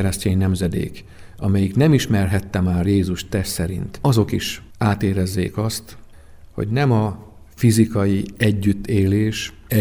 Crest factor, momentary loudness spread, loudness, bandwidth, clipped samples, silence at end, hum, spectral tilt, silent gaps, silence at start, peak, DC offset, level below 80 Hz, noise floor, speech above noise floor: 18 dB; 10 LU; -20 LUFS; over 20 kHz; under 0.1%; 0 s; none; -6.5 dB/octave; none; 0 s; -2 dBFS; under 0.1%; -40 dBFS; -42 dBFS; 23 dB